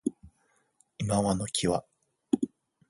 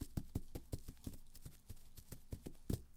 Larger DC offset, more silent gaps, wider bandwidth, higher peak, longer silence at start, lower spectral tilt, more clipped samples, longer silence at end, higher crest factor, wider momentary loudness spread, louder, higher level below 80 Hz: neither; neither; second, 11.5 kHz vs 17.5 kHz; first, -10 dBFS vs -26 dBFS; about the same, 0.05 s vs 0 s; second, -5 dB/octave vs -6.5 dB/octave; neither; first, 0.45 s vs 0 s; about the same, 22 dB vs 24 dB; second, 9 LU vs 12 LU; first, -30 LUFS vs -52 LUFS; about the same, -56 dBFS vs -54 dBFS